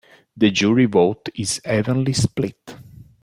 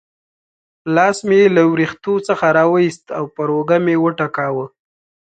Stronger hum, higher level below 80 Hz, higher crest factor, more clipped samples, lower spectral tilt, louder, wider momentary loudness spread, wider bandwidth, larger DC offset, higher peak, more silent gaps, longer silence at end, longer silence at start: neither; first, -50 dBFS vs -60 dBFS; about the same, 16 dB vs 16 dB; neither; second, -5 dB/octave vs -6.5 dB/octave; second, -19 LUFS vs -16 LUFS; second, 10 LU vs 13 LU; first, 15 kHz vs 9.2 kHz; neither; second, -4 dBFS vs 0 dBFS; neither; second, 0.4 s vs 0.65 s; second, 0.35 s vs 0.85 s